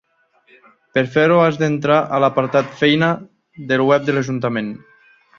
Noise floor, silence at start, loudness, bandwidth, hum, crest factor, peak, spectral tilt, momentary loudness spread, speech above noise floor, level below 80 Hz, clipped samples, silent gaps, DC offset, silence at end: -58 dBFS; 0.95 s; -17 LUFS; 7.2 kHz; none; 16 dB; -2 dBFS; -6.5 dB/octave; 10 LU; 41 dB; -58 dBFS; under 0.1%; none; under 0.1%; 0.6 s